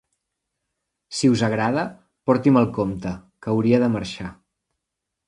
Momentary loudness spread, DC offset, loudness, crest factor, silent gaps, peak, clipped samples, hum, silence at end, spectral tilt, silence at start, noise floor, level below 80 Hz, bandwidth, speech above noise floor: 14 LU; under 0.1%; -21 LUFS; 20 dB; none; -2 dBFS; under 0.1%; none; 0.95 s; -6.5 dB/octave; 1.1 s; -82 dBFS; -52 dBFS; 11 kHz; 62 dB